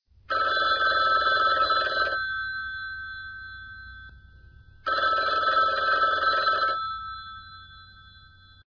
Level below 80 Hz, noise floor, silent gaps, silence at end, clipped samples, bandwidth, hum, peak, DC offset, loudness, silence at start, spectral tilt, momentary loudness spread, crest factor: -54 dBFS; -52 dBFS; none; 0.5 s; under 0.1%; 5.4 kHz; none; -12 dBFS; under 0.1%; -24 LUFS; 0.3 s; -3 dB/octave; 20 LU; 16 dB